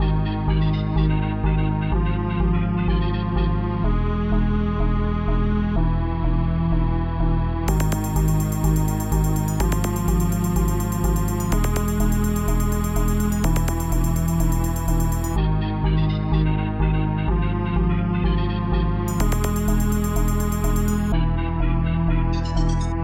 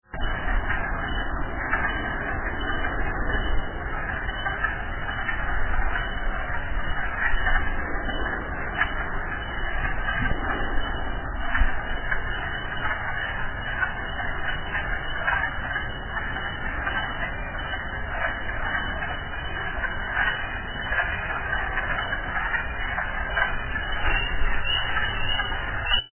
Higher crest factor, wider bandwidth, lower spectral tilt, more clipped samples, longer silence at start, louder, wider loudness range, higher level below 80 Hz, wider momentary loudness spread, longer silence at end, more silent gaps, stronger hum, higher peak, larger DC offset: second, 12 dB vs 18 dB; first, 17 kHz vs 3.2 kHz; second, -6.5 dB/octave vs -8 dB/octave; neither; about the same, 0 s vs 0.1 s; first, -22 LUFS vs -27 LUFS; about the same, 1 LU vs 3 LU; first, -24 dBFS vs -32 dBFS; second, 2 LU vs 5 LU; about the same, 0 s vs 0.05 s; neither; neither; about the same, -6 dBFS vs -8 dBFS; neither